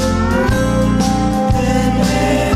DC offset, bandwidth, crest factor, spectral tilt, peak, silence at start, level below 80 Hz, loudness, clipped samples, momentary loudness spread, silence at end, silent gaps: under 0.1%; 15.5 kHz; 10 dB; -6 dB/octave; -4 dBFS; 0 s; -24 dBFS; -15 LUFS; under 0.1%; 1 LU; 0 s; none